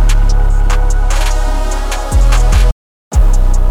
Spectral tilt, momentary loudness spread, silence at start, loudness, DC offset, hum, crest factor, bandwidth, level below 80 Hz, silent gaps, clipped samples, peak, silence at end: -4.5 dB/octave; 6 LU; 0 s; -15 LUFS; under 0.1%; none; 8 dB; 12.5 kHz; -10 dBFS; 2.72-3.11 s; under 0.1%; -2 dBFS; 0 s